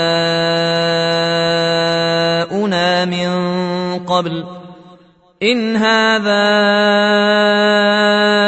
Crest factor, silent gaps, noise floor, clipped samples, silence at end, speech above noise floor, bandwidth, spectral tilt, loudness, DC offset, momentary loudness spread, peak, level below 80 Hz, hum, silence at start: 14 dB; none; -46 dBFS; under 0.1%; 0 s; 33 dB; 8.4 kHz; -5 dB/octave; -14 LUFS; under 0.1%; 6 LU; 0 dBFS; -56 dBFS; none; 0 s